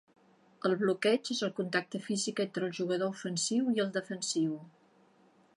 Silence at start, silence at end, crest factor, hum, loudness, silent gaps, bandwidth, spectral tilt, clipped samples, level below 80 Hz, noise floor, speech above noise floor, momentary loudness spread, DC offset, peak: 0.65 s; 0.85 s; 18 dB; none; -32 LUFS; none; 11.5 kHz; -4 dB/octave; under 0.1%; -86 dBFS; -65 dBFS; 33 dB; 6 LU; under 0.1%; -16 dBFS